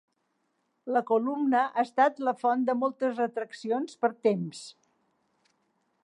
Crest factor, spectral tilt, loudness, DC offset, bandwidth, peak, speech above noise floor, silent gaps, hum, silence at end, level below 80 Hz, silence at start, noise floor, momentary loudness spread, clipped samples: 20 dB; -6 dB/octave; -28 LUFS; under 0.1%; 11 kHz; -10 dBFS; 49 dB; none; none; 1.35 s; -88 dBFS; 0.85 s; -76 dBFS; 10 LU; under 0.1%